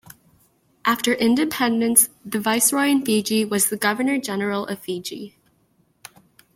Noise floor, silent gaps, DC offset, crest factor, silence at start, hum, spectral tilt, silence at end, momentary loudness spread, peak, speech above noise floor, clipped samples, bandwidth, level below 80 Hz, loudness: -63 dBFS; none; under 0.1%; 22 dB; 0.85 s; none; -2.5 dB/octave; 1.25 s; 13 LU; 0 dBFS; 42 dB; under 0.1%; 16.5 kHz; -66 dBFS; -20 LUFS